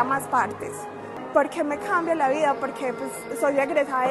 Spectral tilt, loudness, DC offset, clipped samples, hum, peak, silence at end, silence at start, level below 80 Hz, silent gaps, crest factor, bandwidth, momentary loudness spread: -4.5 dB/octave; -24 LUFS; under 0.1%; under 0.1%; none; -6 dBFS; 0 s; 0 s; -66 dBFS; none; 20 dB; 13 kHz; 12 LU